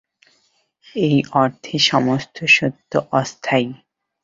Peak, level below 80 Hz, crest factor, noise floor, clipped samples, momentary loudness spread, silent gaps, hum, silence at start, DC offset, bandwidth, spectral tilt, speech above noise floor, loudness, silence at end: -2 dBFS; -58 dBFS; 18 dB; -63 dBFS; under 0.1%; 8 LU; none; none; 0.95 s; under 0.1%; 7.8 kHz; -4.5 dB/octave; 45 dB; -18 LUFS; 0.5 s